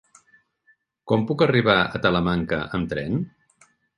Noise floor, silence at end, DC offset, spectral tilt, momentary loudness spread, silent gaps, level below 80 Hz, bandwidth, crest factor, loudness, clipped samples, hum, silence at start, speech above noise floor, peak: -64 dBFS; 0.7 s; under 0.1%; -7.5 dB/octave; 9 LU; none; -48 dBFS; 10.5 kHz; 20 dB; -22 LUFS; under 0.1%; none; 1.05 s; 42 dB; -4 dBFS